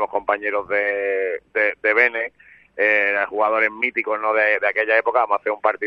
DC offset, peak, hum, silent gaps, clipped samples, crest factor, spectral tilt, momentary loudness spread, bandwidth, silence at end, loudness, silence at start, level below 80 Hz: under 0.1%; -2 dBFS; none; none; under 0.1%; 18 dB; -5 dB/octave; 6 LU; 6 kHz; 0 s; -19 LUFS; 0 s; -66 dBFS